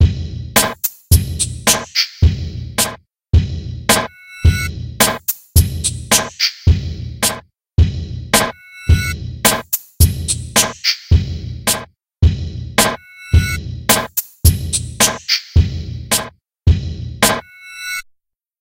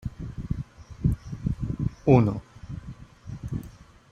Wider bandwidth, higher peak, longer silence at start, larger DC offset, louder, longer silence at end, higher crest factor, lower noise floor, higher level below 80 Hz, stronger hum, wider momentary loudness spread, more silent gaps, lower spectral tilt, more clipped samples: first, 17 kHz vs 7.4 kHz; first, 0 dBFS vs -4 dBFS; about the same, 0 s vs 0.05 s; neither; first, -16 LUFS vs -27 LUFS; first, 0.6 s vs 0.4 s; second, 16 dB vs 24 dB; first, -63 dBFS vs -48 dBFS; first, -24 dBFS vs -40 dBFS; neither; second, 10 LU vs 22 LU; neither; second, -3.5 dB/octave vs -9.5 dB/octave; neither